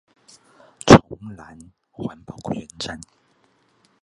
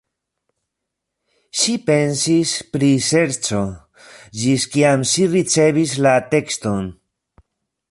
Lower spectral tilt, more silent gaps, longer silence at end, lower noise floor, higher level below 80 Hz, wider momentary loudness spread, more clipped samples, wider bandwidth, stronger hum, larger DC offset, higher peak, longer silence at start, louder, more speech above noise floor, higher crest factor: first, -5.5 dB/octave vs -4 dB/octave; neither; about the same, 1.05 s vs 1 s; second, -62 dBFS vs -80 dBFS; first, -42 dBFS vs -52 dBFS; first, 26 LU vs 9 LU; neither; about the same, 11.5 kHz vs 11.5 kHz; neither; neither; about the same, 0 dBFS vs -2 dBFS; second, 0.85 s vs 1.55 s; about the same, -17 LUFS vs -17 LUFS; second, 29 dB vs 63 dB; first, 22 dB vs 16 dB